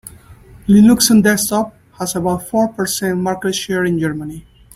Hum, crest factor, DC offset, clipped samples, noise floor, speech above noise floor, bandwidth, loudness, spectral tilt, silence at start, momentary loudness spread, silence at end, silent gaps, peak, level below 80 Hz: none; 16 dB; under 0.1%; under 0.1%; -41 dBFS; 27 dB; 16 kHz; -15 LUFS; -4.5 dB/octave; 0.05 s; 15 LU; 0.35 s; none; 0 dBFS; -44 dBFS